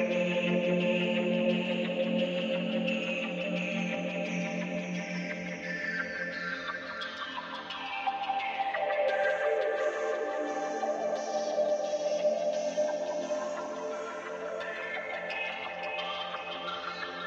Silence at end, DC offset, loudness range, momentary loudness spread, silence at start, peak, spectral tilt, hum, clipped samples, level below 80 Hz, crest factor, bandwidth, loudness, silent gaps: 0 s; under 0.1%; 5 LU; 8 LU; 0 s; -16 dBFS; -5 dB/octave; none; under 0.1%; -76 dBFS; 16 dB; 8.2 kHz; -32 LUFS; none